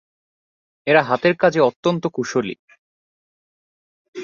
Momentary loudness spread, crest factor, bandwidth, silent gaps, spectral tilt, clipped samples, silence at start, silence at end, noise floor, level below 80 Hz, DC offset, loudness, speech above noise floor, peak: 14 LU; 20 dB; 7.4 kHz; 1.76-1.83 s, 2.59-2.68 s, 2.78-4.13 s; -5.5 dB/octave; under 0.1%; 0.85 s; 0 s; under -90 dBFS; -64 dBFS; under 0.1%; -19 LUFS; over 72 dB; -2 dBFS